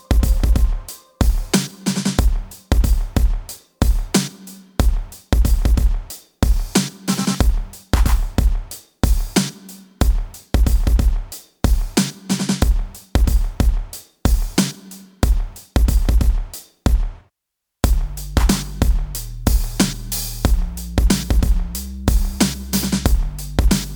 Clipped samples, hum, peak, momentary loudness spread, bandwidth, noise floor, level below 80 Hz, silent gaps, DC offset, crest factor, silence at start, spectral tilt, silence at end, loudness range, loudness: under 0.1%; none; 0 dBFS; 10 LU; over 20 kHz; -80 dBFS; -18 dBFS; none; under 0.1%; 18 dB; 0.1 s; -5 dB/octave; 0 s; 1 LU; -20 LUFS